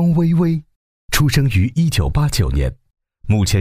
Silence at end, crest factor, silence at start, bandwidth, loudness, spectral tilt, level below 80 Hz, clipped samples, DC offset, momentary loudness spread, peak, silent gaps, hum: 0 s; 14 dB; 0 s; 16 kHz; -17 LUFS; -5.5 dB/octave; -26 dBFS; under 0.1%; under 0.1%; 7 LU; -2 dBFS; 0.76-1.08 s; none